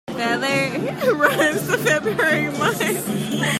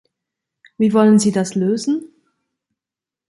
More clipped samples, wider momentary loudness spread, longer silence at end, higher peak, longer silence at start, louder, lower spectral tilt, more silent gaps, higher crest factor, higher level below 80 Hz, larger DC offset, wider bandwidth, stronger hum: neither; second, 5 LU vs 9 LU; second, 0 s vs 1.25 s; about the same, -2 dBFS vs -4 dBFS; second, 0.1 s vs 0.8 s; second, -19 LUFS vs -16 LUFS; second, -4 dB/octave vs -6 dB/octave; neither; about the same, 18 dB vs 16 dB; first, -56 dBFS vs -62 dBFS; neither; first, 16 kHz vs 11.5 kHz; neither